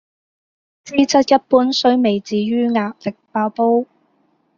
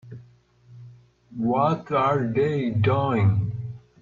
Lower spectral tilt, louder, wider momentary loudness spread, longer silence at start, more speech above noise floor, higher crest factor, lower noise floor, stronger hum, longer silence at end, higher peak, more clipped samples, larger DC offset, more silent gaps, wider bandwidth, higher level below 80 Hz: second, -3.5 dB/octave vs -9 dB/octave; first, -17 LUFS vs -23 LUFS; second, 10 LU vs 14 LU; first, 0.85 s vs 0.05 s; first, 46 dB vs 33 dB; about the same, 16 dB vs 16 dB; first, -62 dBFS vs -54 dBFS; second, none vs 60 Hz at -40 dBFS; first, 0.75 s vs 0.25 s; first, -2 dBFS vs -8 dBFS; neither; neither; neither; about the same, 7.4 kHz vs 7 kHz; about the same, -60 dBFS vs -56 dBFS